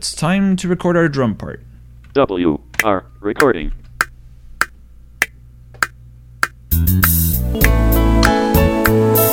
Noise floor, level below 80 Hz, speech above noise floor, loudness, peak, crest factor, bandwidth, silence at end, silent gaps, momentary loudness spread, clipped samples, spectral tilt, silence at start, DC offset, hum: -41 dBFS; -24 dBFS; 25 dB; -16 LUFS; 0 dBFS; 16 dB; 17 kHz; 0 s; none; 9 LU; under 0.1%; -5.5 dB/octave; 0 s; under 0.1%; none